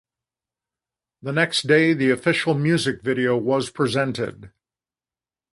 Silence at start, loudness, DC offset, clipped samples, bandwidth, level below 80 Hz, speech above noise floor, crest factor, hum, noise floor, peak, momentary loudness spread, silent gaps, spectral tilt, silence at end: 1.25 s; -21 LUFS; under 0.1%; under 0.1%; 11.5 kHz; -60 dBFS; over 69 dB; 20 dB; none; under -90 dBFS; -4 dBFS; 9 LU; none; -5.5 dB/octave; 1.05 s